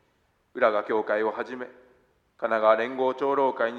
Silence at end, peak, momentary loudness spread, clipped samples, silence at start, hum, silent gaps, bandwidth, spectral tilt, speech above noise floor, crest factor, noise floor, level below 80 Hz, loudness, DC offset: 0 s; -6 dBFS; 15 LU; under 0.1%; 0.55 s; none; none; 7 kHz; -6 dB/octave; 44 dB; 20 dB; -69 dBFS; -76 dBFS; -25 LUFS; under 0.1%